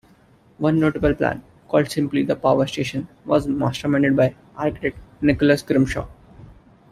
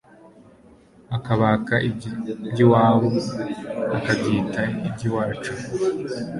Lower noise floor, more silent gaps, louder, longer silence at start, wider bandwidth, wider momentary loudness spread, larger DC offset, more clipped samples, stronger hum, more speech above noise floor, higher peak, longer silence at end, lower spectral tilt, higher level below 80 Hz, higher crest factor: about the same, -54 dBFS vs -51 dBFS; neither; about the same, -21 LUFS vs -22 LUFS; first, 0.6 s vs 0.25 s; first, 14 kHz vs 11.5 kHz; second, 9 LU vs 13 LU; neither; neither; neither; first, 34 dB vs 29 dB; about the same, -2 dBFS vs -2 dBFS; first, 0.4 s vs 0 s; about the same, -7 dB/octave vs -7 dB/octave; first, -42 dBFS vs -52 dBFS; about the same, 18 dB vs 20 dB